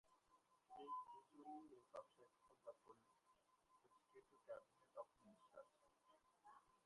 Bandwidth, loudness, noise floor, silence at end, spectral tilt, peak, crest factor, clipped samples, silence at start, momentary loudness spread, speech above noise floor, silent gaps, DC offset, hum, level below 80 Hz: 11 kHz; -61 LUFS; -82 dBFS; 0.05 s; -5 dB/octave; -44 dBFS; 20 dB; under 0.1%; 0.05 s; 12 LU; 19 dB; none; under 0.1%; none; under -90 dBFS